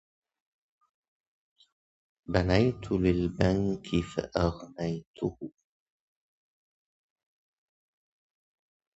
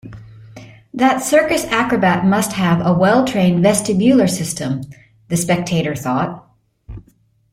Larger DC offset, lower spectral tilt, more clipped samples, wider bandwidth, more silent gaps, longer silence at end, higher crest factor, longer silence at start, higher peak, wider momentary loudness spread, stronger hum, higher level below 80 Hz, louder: neither; first, -7.5 dB/octave vs -5.5 dB/octave; neither; second, 8 kHz vs 16.5 kHz; first, 5.07-5.14 s vs none; first, 3.5 s vs 0.55 s; first, 26 dB vs 16 dB; first, 2.3 s vs 0.05 s; second, -8 dBFS vs -2 dBFS; about the same, 10 LU vs 11 LU; neither; about the same, -46 dBFS vs -46 dBFS; second, -29 LUFS vs -16 LUFS